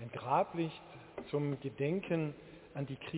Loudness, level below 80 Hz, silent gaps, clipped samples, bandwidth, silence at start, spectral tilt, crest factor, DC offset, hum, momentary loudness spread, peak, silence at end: -37 LUFS; -68 dBFS; none; under 0.1%; 4 kHz; 0 s; -6.5 dB/octave; 20 dB; under 0.1%; none; 16 LU; -18 dBFS; 0 s